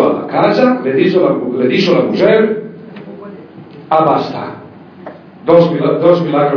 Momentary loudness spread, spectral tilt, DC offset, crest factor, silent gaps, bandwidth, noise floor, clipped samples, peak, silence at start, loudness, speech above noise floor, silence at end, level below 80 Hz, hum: 22 LU; -8 dB/octave; under 0.1%; 12 dB; none; 5.4 kHz; -34 dBFS; 0.3%; 0 dBFS; 0 s; -12 LUFS; 23 dB; 0 s; -60 dBFS; none